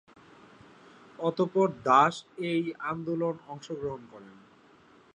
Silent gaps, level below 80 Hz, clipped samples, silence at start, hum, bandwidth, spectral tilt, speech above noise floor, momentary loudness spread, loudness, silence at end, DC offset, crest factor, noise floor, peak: none; -70 dBFS; under 0.1%; 1.2 s; none; 10 kHz; -6 dB/octave; 30 dB; 17 LU; -28 LUFS; 0.85 s; under 0.1%; 22 dB; -58 dBFS; -8 dBFS